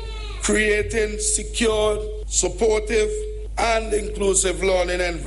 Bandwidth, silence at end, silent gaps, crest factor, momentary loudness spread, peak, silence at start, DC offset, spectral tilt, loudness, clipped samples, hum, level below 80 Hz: 11.5 kHz; 0 s; none; 16 dB; 7 LU; -6 dBFS; 0 s; under 0.1%; -3 dB/octave; -21 LUFS; under 0.1%; none; -30 dBFS